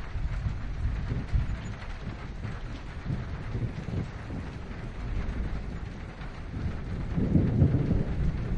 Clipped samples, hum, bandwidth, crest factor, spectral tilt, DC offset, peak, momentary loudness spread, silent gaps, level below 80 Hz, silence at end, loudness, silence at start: under 0.1%; none; 8.8 kHz; 20 dB; -8.5 dB/octave; under 0.1%; -10 dBFS; 14 LU; none; -36 dBFS; 0 s; -33 LUFS; 0 s